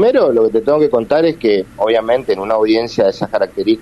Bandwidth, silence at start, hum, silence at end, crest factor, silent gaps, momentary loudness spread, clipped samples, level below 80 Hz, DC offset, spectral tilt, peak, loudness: 12 kHz; 0 s; none; 0 s; 10 dB; none; 4 LU; under 0.1%; -48 dBFS; under 0.1%; -6.5 dB/octave; -4 dBFS; -14 LUFS